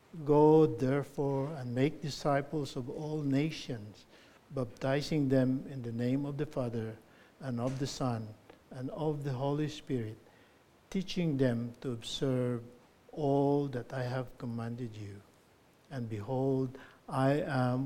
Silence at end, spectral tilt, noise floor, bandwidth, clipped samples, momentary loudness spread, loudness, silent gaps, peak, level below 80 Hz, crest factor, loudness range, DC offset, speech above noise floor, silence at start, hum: 0 s; -7 dB/octave; -64 dBFS; 15 kHz; under 0.1%; 14 LU; -33 LUFS; none; -14 dBFS; -60 dBFS; 20 dB; 4 LU; under 0.1%; 32 dB; 0.15 s; none